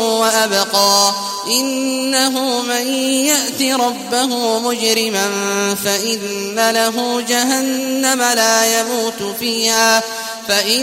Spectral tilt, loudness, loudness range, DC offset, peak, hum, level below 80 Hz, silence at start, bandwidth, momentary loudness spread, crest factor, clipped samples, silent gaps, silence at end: -1 dB/octave; -15 LUFS; 2 LU; under 0.1%; 0 dBFS; none; -62 dBFS; 0 s; 16 kHz; 7 LU; 16 dB; under 0.1%; none; 0 s